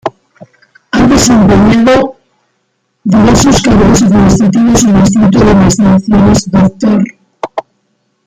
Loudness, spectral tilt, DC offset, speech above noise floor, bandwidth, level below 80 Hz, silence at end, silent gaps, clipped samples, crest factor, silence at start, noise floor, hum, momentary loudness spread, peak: -7 LUFS; -5.5 dB/octave; under 0.1%; 55 dB; 14.5 kHz; -26 dBFS; 0.65 s; none; under 0.1%; 8 dB; 0.05 s; -61 dBFS; none; 13 LU; 0 dBFS